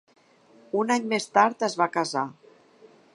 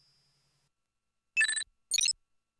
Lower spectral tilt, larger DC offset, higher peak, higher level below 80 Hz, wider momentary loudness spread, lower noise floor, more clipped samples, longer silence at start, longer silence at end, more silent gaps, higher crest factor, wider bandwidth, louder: first, -4 dB/octave vs 5 dB/octave; neither; first, -4 dBFS vs -16 dBFS; second, -82 dBFS vs -76 dBFS; about the same, 9 LU vs 7 LU; second, -57 dBFS vs -86 dBFS; neither; second, 0.75 s vs 1.35 s; first, 0.85 s vs 0.5 s; neither; about the same, 22 dB vs 20 dB; about the same, 11.5 kHz vs 11 kHz; first, -25 LUFS vs -29 LUFS